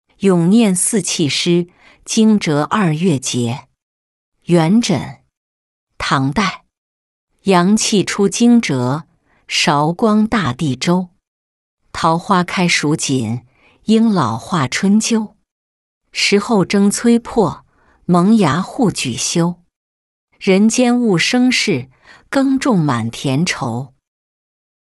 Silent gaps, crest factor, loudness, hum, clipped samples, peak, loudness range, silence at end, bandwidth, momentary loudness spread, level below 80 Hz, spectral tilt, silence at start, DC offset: 3.83-4.32 s, 5.37-5.87 s, 6.78-7.27 s, 11.27-11.78 s, 15.51-16.01 s, 19.76-20.28 s; 14 dB; -15 LUFS; none; under 0.1%; -2 dBFS; 4 LU; 1.15 s; 12 kHz; 11 LU; -50 dBFS; -4.5 dB/octave; 0.2 s; under 0.1%